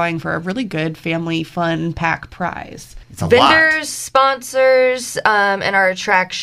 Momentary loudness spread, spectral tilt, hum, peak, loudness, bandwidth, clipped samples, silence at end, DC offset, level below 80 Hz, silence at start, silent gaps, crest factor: 11 LU; -4 dB/octave; none; 0 dBFS; -16 LUFS; 15 kHz; under 0.1%; 0 s; under 0.1%; -46 dBFS; 0 s; none; 16 dB